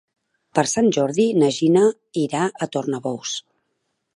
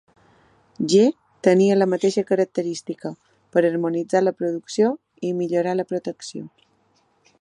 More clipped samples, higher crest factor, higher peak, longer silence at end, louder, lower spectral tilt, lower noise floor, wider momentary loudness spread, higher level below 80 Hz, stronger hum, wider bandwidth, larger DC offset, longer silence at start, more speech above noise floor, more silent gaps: neither; about the same, 18 dB vs 18 dB; about the same, -2 dBFS vs -4 dBFS; second, 0.75 s vs 0.95 s; about the same, -20 LUFS vs -21 LUFS; about the same, -5 dB/octave vs -6 dB/octave; first, -74 dBFS vs -64 dBFS; second, 9 LU vs 15 LU; first, -66 dBFS vs -74 dBFS; neither; about the same, 11.5 kHz vs 11 kHz; neither; second, 0.55 s vs 0.8 s; first, 54 dB vs 43 dB; neither